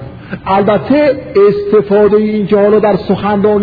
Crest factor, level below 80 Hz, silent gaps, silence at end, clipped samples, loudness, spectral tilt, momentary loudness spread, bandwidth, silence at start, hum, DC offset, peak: 10 dB; -40 dBFS; none; 0 s; under 0.1%; -10 LUFS; -10 dB/octave; 5 LU; 5 kHz; 0 s; none; under 0.1%; 0 dBFS